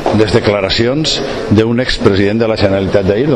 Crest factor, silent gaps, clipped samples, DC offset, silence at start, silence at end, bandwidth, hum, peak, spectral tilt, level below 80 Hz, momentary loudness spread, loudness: 12 dB; none; under 0.1%; under 0.1%; 0 s; 0 s; 10.5 kHz; none; 0 dBFS; -6 dB/octave; -30 dBFS; 2 LU; -12 LUFS